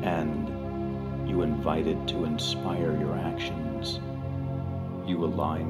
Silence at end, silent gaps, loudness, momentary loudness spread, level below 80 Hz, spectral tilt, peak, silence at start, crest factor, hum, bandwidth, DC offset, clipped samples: 0 s; none; -30 LUFS; 6 LU; -44 dBFS; -6.5 dB/octave; -12 dBFS; 0 s; 18 dB; none; 14 kHz; under 0.1%; under 0.1%